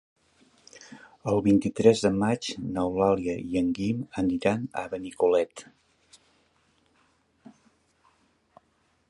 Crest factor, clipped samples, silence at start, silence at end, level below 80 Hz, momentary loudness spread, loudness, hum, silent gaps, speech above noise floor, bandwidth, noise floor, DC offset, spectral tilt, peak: 22 dB; under 0.1%; 0.75 s; 3.45 s; -56 dBFS; 14 LU; -26 LUFS; none; none; 44 dB; 11.5 kHz; -69 dBFS; under 0.1%; -6.5 dB/octave; -6 dBFS